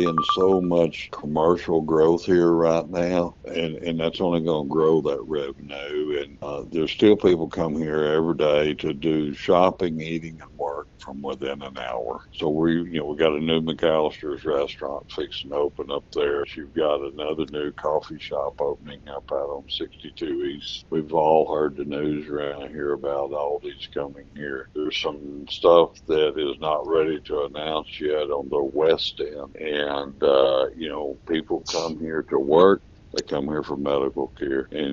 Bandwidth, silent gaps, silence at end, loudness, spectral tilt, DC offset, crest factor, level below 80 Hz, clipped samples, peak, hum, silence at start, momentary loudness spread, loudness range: 7.6 kHz; none; 0 s; -24 LUFS; -4 dB/octave; under 0.1%; 20 dB; -50 dBFS; under 0.1%; -2 dBFS; none; 0 s; 13 LU; 6 LU